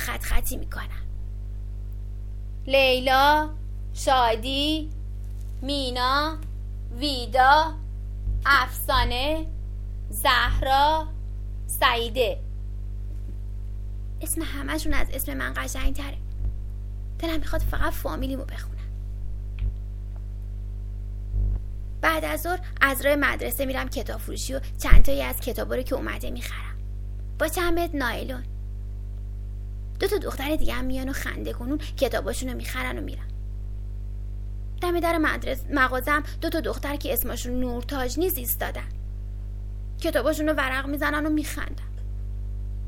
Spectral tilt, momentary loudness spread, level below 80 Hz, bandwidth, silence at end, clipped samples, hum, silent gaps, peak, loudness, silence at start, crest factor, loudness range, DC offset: -4.5 dB/octave; 16 LU; -30 dBFS; 18 kHz; 0 s; under 0.1%; 50 Hz at -30 dBFS; none; 0 dBFS; -27 LUFS; 0 s; 24 dB; 8 LU; under 0.1%